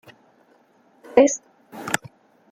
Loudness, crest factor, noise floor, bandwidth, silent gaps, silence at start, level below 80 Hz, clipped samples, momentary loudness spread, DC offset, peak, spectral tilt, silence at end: -21 LUFS; 22 dB; -58 dBFS; 16 kHz; none; 1.15 s; -64 dBFS; under 0.1%; 19 LU; under 0.1%; -2 dBFS; -3.5 dB/octave; 0.55 s